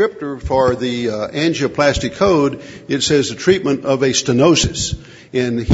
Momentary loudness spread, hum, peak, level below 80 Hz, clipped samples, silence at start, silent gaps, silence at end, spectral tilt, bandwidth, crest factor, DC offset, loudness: 9 LU; none; 0 dBFS; -36 dBFS; under 0.1%; 0 s; none; 0 s; -4.5 dB/octave; 8 kHz; 16 dB; under 0.1%; -16 LUFS